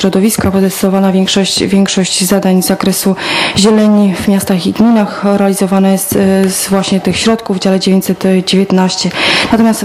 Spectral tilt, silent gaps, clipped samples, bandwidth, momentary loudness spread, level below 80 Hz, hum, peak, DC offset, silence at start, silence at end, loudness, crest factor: -4.5 dB/octave; none; under 0.1%; 15 kHz; 3 LU; -40 dBFS; none; 0 dBFS; under 0.1%; 0 s; 0 s; -10 LUFS; 10 dB